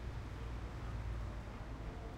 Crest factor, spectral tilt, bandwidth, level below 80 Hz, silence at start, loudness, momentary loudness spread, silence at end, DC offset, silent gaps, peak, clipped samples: 10 dB; -7 dB/octave; 10.5 kHz; -46 dBFS; 0 s; -47 LUFS; 3 LU; 0 s; under 0.1%; none; -34 dBFS; under 0.1%